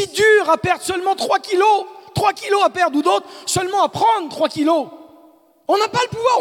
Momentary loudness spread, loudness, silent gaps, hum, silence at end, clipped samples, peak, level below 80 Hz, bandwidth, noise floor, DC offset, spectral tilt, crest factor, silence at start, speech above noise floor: 7 LU; -17 LUFS; none; none; 0 s; under 0.1%; -2 dBFS; -56 dBFS; 17.5 kHz; -50 dBFS; under 0.1%; -3.5 dB/octave; 16 dB; 0 s; 33 dB